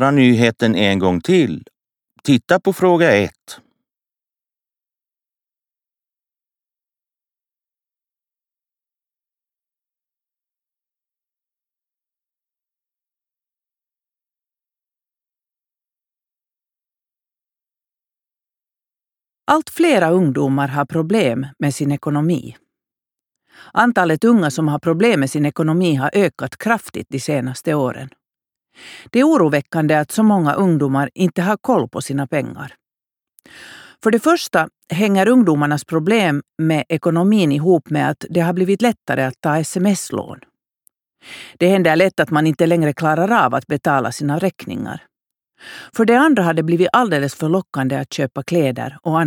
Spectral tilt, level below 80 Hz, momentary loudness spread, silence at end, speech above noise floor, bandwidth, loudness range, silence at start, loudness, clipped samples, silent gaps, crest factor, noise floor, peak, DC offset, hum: -6 dB/octave; -62 dBFS; 10 LU; 0 s; over 74 dB; 19 kHz; 4 LU; 0 s; -17 LUFS; under 0.1%; none; 18 dB; under -90 dBFS; 0 dBFS; under 0.1%; none